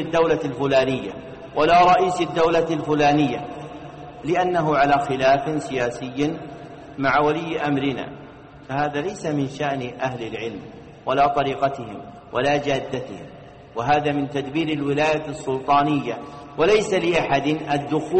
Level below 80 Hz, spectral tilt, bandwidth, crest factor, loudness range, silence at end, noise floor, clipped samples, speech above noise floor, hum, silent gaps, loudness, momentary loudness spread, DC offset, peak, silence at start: -50 dBFS; -6 dB/octave; 8.8 kHz; 14 dB; 5 LU; 0 s; -42 dBFS; under 0.1%; 21 dB; none; none; -21 LUFS; 16 LU; under 0.1%; -8 dBFS; 0 s